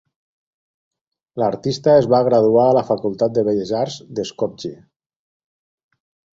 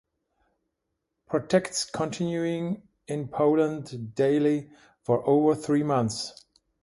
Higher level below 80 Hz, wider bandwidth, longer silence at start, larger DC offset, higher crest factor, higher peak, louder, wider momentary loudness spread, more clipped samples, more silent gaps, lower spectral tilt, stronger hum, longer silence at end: first, -58 dBFS vs -64 dBFS; second, 7.8 kHz vs 11.5 kHz; about the same, 1.35 s vs 1.3 s; neither; about the same, 18 dB vs 18 dB; first, -2 dBFS vs -8 dBFS; first, -18 LUFS vs -26 LUFS; about the same, 13 LU vs 12 LU; neither; neither; about the same, -6.5 dB/octave vs -5.5 dB/octave; neither; first, 1.65 s vs 0.5 s